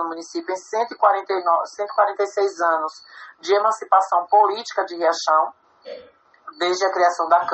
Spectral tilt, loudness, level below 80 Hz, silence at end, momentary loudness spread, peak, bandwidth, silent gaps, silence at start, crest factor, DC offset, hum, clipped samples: -1.5 dB/octave; -20 LUFS; -78 dBFS; 0 s; 12 LU; -2 dBFS; 8.4 kHz; none; 0 s; 20 dB; under 0.1%; none; under 0.1%